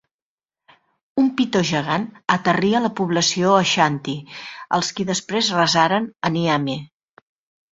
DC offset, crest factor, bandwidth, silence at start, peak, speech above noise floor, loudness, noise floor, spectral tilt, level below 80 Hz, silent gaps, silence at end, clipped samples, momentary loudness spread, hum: under 0.1%; 18 dB; 8 kHz; 1.15 s; -2 dBFS; over 70 dB; -19 LUFS; under -90 dBFS; -4 dB/octave; -60 dBFS; none; 0.85 s; under 0.1%; 11 LU; none